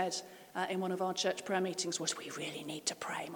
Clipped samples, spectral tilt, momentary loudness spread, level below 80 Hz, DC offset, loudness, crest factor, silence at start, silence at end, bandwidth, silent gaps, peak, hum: under 0.1%; -3 dB/octave; 7 LU; -84 dBFS; under 0.1%; -37 LUFS; 18 dB; 0 s; 0 s; 19 kHz; none; -18 dBFS; none